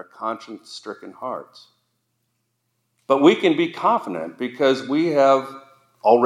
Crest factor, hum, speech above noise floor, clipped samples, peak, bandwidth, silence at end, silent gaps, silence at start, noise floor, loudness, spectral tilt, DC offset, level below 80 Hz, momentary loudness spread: 20 dB; none; 52 dB; under 0.1%; 0 dBFS; 12 kHz; 0 s; none; 0.2 s; -73 dBFS; -20 LUFS; -5.5 dB/octave; under 0.1%; -84 dBFS; 19 LU